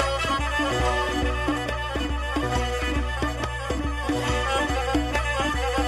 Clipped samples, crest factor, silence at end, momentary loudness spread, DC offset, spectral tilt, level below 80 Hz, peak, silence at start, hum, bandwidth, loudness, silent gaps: under 0.1%; 16 dB; 0 s; 4 LU; under 0.1%; -4.5 dB/octave; -30 dBFS; -8 dBFS; 0 s; none; 13.5 kHz; -25 LUFS; none